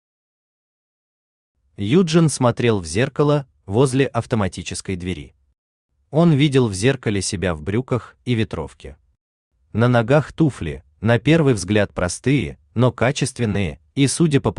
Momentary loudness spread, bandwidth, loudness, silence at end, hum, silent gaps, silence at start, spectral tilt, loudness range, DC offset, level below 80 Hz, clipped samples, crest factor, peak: 11 LU; 11 kHz; -19 LUFS; 0.05 s; none; 5.58-5.89 s, 9.21-9.51 s; 1.8 s; -6 dB/octave; 3 LU; under 0.1%; -46 dBFS; under 0.1%; 16 dB; -2 dBFS